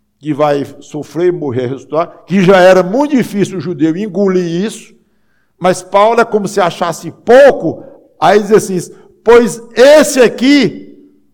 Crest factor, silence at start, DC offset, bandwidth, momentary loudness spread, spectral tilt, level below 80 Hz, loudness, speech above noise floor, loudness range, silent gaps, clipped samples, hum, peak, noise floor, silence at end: 10 dB; 0.25 s; under 0.1%; 18 kHz; 15 LU; -5 dB/octave; -48 dBFS; -10 LUFS; 49 dB; 5 LU; none; under 0.1%; none; 0 dBFS; -59 dBFS; 0.5 s